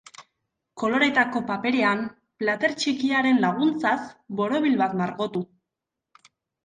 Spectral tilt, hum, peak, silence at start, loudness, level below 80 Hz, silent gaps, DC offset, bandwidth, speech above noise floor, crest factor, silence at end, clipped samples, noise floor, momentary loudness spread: -5 dB/octave; none; -6 dBFS; 0.2 s; -24 LUFS; -68 dBFS; none; under 0.1%; 9.6 kHz; 62 dB; 18 dB; 1.2 s; under 0.1%; -85 dBFS; 9 LU